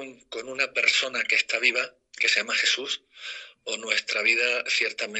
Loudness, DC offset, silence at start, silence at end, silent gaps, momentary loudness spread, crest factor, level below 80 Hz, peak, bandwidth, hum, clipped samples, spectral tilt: -23 LUFS; under 0.1%; 0 s; 0 s; none; 16 LU; 20 dB; -78 dBFS; -6 dBFS; 9.2 kHz; none; under 0.1%; 1 dB/octave